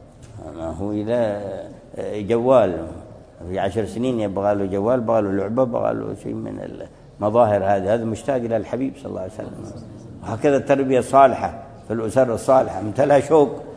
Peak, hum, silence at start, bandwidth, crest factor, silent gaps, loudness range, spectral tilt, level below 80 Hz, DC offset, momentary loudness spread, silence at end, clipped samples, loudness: 0 dBFS; none; 0 s; 11 kHz; 20 dB; none; 4 LU; -7 dB/octave; -50 dBFS; under 0.1%; 18 LU; 0 s; under 0.1%; -20 LUFS